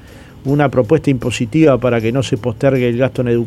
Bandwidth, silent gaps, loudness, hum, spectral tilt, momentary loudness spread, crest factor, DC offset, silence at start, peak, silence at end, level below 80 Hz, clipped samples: 12.5 kHz; none; -15 LUFS; none; -7 dB/octave; 6 LU; 14 dB; under 0.1%; 0.1 s; 0 dBFS; 0 s; -40 dBFS; under 0.1%